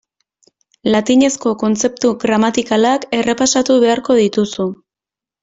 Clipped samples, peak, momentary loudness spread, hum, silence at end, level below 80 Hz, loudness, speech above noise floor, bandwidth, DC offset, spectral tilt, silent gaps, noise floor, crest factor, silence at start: under 0.1%; -2 dBFS; 5 LU; none; 0.7 s; -54 dBFS; -15 LUFS; 74 dB; 8 kHz; under 0.1%; -4 dB/octave; none; -88 dBFS; 14 dB; 0.85 s